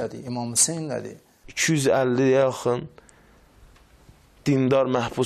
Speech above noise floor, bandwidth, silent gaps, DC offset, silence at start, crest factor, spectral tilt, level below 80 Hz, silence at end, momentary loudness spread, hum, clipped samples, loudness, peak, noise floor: 32 dB; 14 kHz; none; under 0.1%; 0 s; 16 dB; -4 dB/octave; -58 dBFS; 0 s; 12 LU; none; under 0.1%; -22 LUFS; -8 dBFS; -54 dBFS